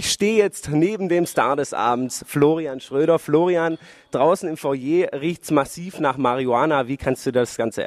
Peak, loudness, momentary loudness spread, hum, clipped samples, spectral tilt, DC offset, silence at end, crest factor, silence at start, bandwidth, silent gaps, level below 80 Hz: -4 dBFS; -21 LUFS; 7 LU; none; under 0.1%; -5 dB/octave; under 0.1%; 0 s; 16 dB; 0 s; 15.5 kHz; none; -54 dBFS